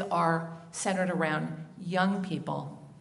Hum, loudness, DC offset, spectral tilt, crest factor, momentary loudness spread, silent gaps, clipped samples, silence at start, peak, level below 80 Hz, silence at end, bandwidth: none; -31 LUFS; under 0.1%; -5.5 dB/octave; 20 dB; 11 LU; none; under 0.1%; 0 s; -12 dBFS; -74 dBFS; 0 s; 11.5 kHz